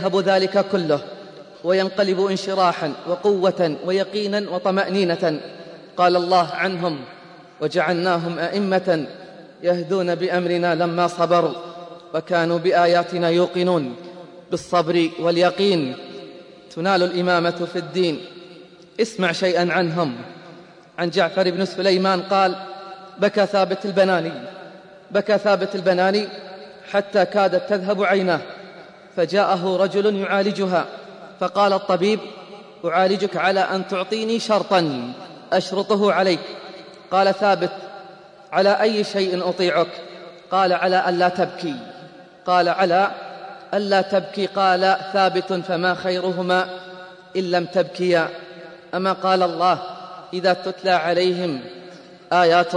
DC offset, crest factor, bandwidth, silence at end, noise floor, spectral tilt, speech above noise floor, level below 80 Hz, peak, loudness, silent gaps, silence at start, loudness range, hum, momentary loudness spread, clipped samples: under 0.1%; 18 dB; 10.5 kHz; 0 s; -44 dBFS; -5.5 dB/octave; 25 dB; -72 dBFS; -2 dBFS; -20 LUFS; none; 0 s; 2 LU; none; 18 LU; under 0.1%